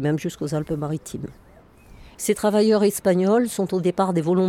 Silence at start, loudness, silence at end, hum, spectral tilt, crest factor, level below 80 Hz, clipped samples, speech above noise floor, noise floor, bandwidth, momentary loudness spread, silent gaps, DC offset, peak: 0 s; -22 LUFS; 0 s; none; -6 dB/octave; 14 dB; -52 dBFS; under 0.1%; 28 dB; -49 dBFS; 17 kHz; 11 LU; none; under 0.1%; -8 dBFS